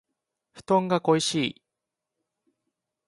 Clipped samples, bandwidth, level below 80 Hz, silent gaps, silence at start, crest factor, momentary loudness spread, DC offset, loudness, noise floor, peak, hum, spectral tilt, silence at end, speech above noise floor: under 0.1%; 11.5 kHz; -70 dBFS; none; 0.55 s; 22 dB; 6 LU; under 0.1%; -25 LUFS; -86 dBFS; -8 dBFS; none; -4.5 dB/octave; 1.55 s; 62 dB